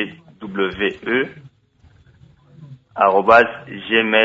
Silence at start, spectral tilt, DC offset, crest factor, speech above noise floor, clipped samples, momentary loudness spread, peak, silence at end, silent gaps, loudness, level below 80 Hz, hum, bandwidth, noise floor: 0 s; -6 dB/octave; under 0.1%; 18 dB; 37 dB; under 0.1%; 18 LU; 0 dBFS; 0 s; none; -17 LUFS; -54 dBFS; none; 7.8 kHz; -53 dBFS